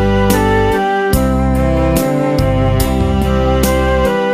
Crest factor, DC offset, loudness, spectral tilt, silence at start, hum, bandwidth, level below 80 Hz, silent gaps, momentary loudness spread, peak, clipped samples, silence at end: 12 dB; under 0.1%; -13 LUFS; -6 dB/octave; 0 s; none; 15.5 kHz; -20 dBFS; none; 2 LU; 0 dBFS; under 0.1%; 0 s